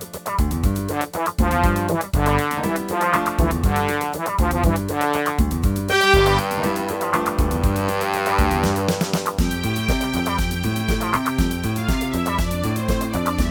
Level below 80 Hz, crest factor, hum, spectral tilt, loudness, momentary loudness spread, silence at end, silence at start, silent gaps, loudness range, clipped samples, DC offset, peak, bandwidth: -26 dBFS; 20 dB; none; -5.5 dB/octave; -21 LUFS; 4 LU; 0 s; 0 s; none; 3 LU; under 0.1%; under 0.1%; 0 dBFS; over 20 kHz